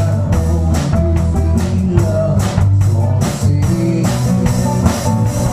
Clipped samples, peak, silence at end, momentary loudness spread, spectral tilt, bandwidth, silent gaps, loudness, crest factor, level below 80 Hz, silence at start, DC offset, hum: under 0.1%; 0 dBFS; 0 s; 2 LU; -7 dB/octave; 15 kHz; none; -14 LUFS; 12 dB; -26 dBFS; 0 s; under 0.1%; none